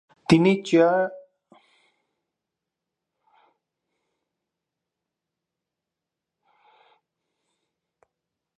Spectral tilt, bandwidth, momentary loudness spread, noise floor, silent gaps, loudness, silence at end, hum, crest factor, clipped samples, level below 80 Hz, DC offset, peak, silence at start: -6.5 dB/octave; 10.5 kHz; 7 LU; -86 dBFS; none; -20 LUFS; 7.4 s; none; 24 dB; under 0.1%; -62 dBFS; under 0.1%; -4 dBFS; 0.3 s